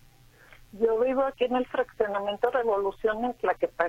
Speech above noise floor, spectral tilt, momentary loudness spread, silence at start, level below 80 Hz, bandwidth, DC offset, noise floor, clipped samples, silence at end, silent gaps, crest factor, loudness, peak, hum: 29 dB; -5.5 dB/octave; 3 LU; 0.75 s; -56 dBFS; 10.5 kHz; under 0.1%; -55 dBFS; under 0.1%; 0 s; none; 16 dB; -27 LUFS; -10 dBFS; none